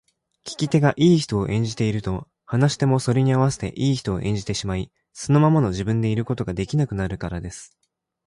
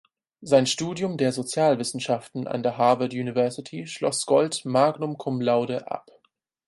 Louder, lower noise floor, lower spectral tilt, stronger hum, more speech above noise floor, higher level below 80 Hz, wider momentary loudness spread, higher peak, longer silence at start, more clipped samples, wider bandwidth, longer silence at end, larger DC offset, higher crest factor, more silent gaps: about the same, -22 LUFS vs -24 LUFS; second, -41 dBFS vs -70 dBFS; first, -6.5 dB/octave vs -4.5 dB/octave; neither; second, 20 dB vs 46 dB; first, -44 dBFS vs -68 dBFS; first, 14 LU vs 10 LU; about the same, -4 dBFS vs -6 dBFS; about the same, 0.45 s vs 0.4 s; neither; about the same, 11.5 kHz vs 11.5 kHz; about the same, 0.6 s vs 0.65 s; neither; about the same, 16 dB vs 20 dB; neither